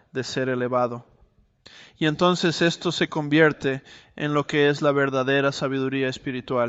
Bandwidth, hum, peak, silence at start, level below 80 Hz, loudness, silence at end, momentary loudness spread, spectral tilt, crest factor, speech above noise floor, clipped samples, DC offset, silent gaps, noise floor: 8.2 kHz; none; -4 dBFS; 0.15 s; -60 dBFS; -23 LUFS; 0 s; 8 LU; -5.5 dB/octave; 20 dB; 37 dB; under 0.1%; under 0.1%; none; -60 dBFS